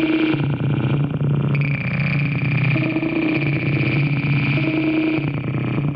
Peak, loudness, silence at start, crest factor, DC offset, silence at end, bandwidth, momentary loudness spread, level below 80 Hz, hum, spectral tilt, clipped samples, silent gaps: -6 dBFS; -20 LUFS; 0 s; 12 dB; under 0.1%; 0 s; 5.2 kHz; 2 LU; -48 dBFS; none; -10 dB/octave; under 0.1%; none